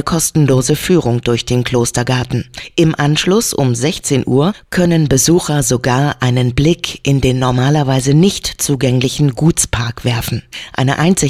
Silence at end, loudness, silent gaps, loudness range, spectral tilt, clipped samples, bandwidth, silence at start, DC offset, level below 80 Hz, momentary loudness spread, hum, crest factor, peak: 0 s; -14 LUFS; none; 1 LU; -5 dB/octave; under 0.1%; 16 kHz; 0 s; 0.1%; -34 dBFS; 6 LU; none; 14 dB; 0 dBFS